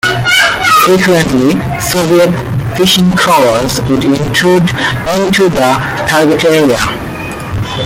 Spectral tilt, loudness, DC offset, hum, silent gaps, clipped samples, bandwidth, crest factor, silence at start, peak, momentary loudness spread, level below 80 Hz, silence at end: -4.5 dB/octave; -9 LUFS; under 0.1%; none; none; under 0.1%; 17 kHz; 10 dB; 0.05 s; 0 dBFS; 8 LU; -32 dBFS; 0 s